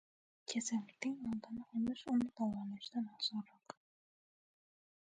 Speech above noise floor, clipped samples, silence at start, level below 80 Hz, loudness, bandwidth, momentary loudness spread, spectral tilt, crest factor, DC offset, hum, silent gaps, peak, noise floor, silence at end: over 49 dB; under 0.1%; 0.5 s; -76 dBFS; -41 LUFS; 9.4 kHz; 15 LU; -4 dB/octave; 18 dB; under 0.1%; none; none; -24 dBFS; under -90 dBFS; 1.35 s